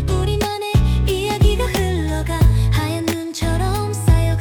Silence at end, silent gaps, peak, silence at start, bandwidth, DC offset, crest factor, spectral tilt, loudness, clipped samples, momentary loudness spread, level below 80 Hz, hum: 0 s; none; -4 dBFS; 0 s; 19 kHz; under 0.1%; 12 dB; -6 dB/octave; -19 LUFS; under 0.1%; 5 LU; -22 dBFS; none